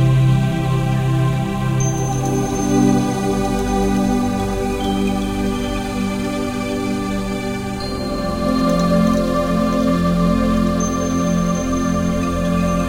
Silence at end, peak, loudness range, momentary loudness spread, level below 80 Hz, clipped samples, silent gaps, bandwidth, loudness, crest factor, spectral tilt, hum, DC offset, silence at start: 0 s; -2 dBFS; 4 LU; 6 LU; -30 dBFS; under 0.1%; none; 16.5 kHz; -18 LUFS; 16 dB; -6.5 dB/octave; none; under 0.1%; 0 s